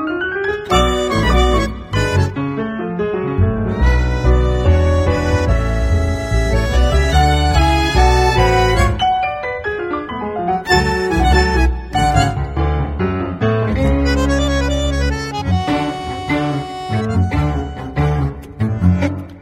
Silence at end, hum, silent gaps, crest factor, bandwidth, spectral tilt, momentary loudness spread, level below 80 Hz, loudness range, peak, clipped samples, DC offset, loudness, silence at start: 0 s; none; none; 14 dB; 12.5 kHz; -6 dB/octave; 8 LU; -20 dBFS; 4 LU; 0 dBFS; under 0.1%; under 0.1%; -16 LUFS; 0 s